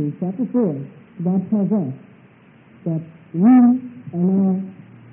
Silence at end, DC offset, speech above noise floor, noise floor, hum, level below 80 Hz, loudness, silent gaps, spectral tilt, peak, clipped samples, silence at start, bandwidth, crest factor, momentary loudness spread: 0.4 s; under 0.1%; 31 dB; -49 dBFS; none; -68 dBFS; -19 LUFS; none; -14.5 dB/octave; -4 dBFS; under 0.1%; 0 s; 3 kHz; 14 dB; 18 LU